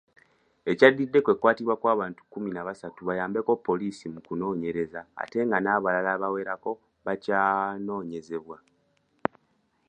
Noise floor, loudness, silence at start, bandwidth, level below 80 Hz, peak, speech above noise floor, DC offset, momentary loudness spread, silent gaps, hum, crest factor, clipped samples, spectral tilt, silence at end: -70 dBFS; -27 LUFS; 0.65 s; 9.2 kHz; -68 dBFS; -4 dBFS; 44 dB; under 0.1%; 14 LU; none; none; 24 dB; under 0.1%; -7 dB/octave; 1.35 s